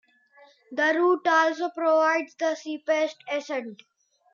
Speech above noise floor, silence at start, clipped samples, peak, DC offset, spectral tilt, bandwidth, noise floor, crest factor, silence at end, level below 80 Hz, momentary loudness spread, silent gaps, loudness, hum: 32 dB; 0.7 s; under 0.1%; -10 dBFS; under 0.1%; -2.5 dB/octave; 7.4 kHz; -57 dBFS; 16 dB; 0.6 s; under -90 dBFS; 12 LU; none; -24 LUFS; none